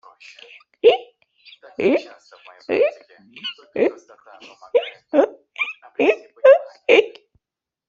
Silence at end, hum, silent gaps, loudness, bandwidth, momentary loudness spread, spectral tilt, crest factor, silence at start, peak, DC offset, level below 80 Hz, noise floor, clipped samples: 0.8 s; none; none; -19 LUFS; 7.4 kHz; 16 LU; -4.5 dB/octave; 20 dB; 0.85 s; -2 dBFS; under 0.1%; -70 dBFS; -87 dBFS; under 0.1%